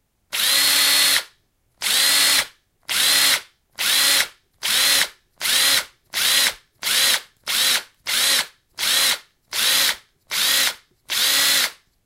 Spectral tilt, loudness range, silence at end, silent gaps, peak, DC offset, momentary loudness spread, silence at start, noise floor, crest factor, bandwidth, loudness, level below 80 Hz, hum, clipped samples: 2.5 dB/octave; 2 LU; 0.3 s; none; -2 dBFS; under 0.1%; 11 LU; 0.3 s; -63 dBFS; 18 dB; 16 kHz; -17 LUFS; -62 dBFS; none; under 0.1%